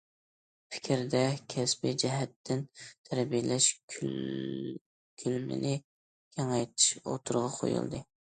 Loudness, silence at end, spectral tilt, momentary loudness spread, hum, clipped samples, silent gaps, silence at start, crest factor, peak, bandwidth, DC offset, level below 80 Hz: -32 LUFS; 0.3 s; -4 dB/octave; 14 LU; none; under 0.1%; 2.36-2.44 s, 2.98-3.04 s, 3.83-3.88 s, 4.81-5.17 s, 5.84-6.31 s; 0.7 s; 22 dB; -10 dBFS; 9.6 kHz; under 0.1%; -70 dBFS